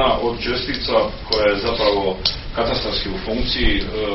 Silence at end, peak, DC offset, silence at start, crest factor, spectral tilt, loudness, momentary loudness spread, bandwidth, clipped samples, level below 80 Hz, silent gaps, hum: 0 s; 0 dBFS; under 0.1%; 0 s; 18 dB; -2.5 dB/octave; -20 LUFS; 5 LU; 6 kHz; under 0.1%; -28 dBFS; none; none